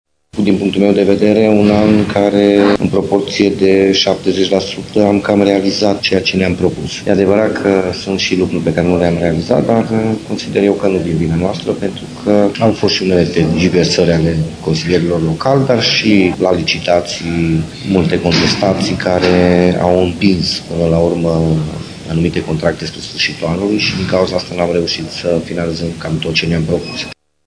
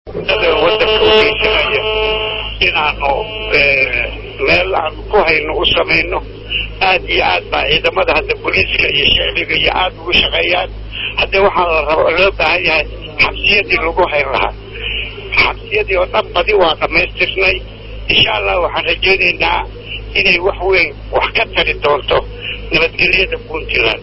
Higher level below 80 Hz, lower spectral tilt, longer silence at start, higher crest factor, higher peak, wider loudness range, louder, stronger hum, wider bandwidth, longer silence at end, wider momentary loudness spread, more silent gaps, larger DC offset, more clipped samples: second, -38 dBFS vs -30 dBFS; about the same, -6 dB/octave vs -6 dB/octave; first, 0.35 s vs 0.05 s; about the same, 12 dB vs 14 dB; about the same, 0 dBFS vs 0 dBFS; about the same, 4 LU vs 2 LU; about the same, -13 LUFS vs -12 LUFS; neither; first, 10.5 kHz vs 8 kHz; first, 0.35 s vs 0 s; about the same, 8 LU vs 9 LU; neither; neither; first, 0.5% vs under 0.1%